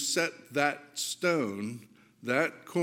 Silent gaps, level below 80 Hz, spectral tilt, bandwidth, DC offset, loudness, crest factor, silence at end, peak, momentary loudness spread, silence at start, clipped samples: none; -82 dBFS; -3 dB/octave; 17 kHz; under 0.1%; -31 LUFS; 22 dB; 0 s; -10 dBFS; 11 LU; 0 s; under 0.1%